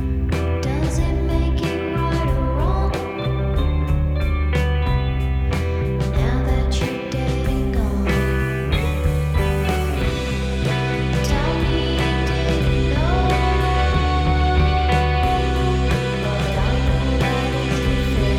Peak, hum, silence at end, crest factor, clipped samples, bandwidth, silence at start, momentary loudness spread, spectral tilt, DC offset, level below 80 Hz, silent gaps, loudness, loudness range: -4 dBFS; none; 0 s; 14 dB; under 0.1%; 14 kHz; 0 s; 4 LU; -6.5 dB/octave; under 0.1%; -22 dBFS; none; -20 LUFS; 3 LU